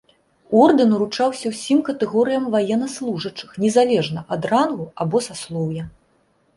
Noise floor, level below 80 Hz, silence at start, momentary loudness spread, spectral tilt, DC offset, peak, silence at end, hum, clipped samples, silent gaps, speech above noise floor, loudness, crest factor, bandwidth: -62 dBFS; -58 dBFS; 0.5 s; 12 LU; -5.5 dB/octave; under 0.1%; -2 dBFS; 0.7 s; none; under 0.1%; none; 43 dB; -20 LUFS; 18 dB; 11.5 kHz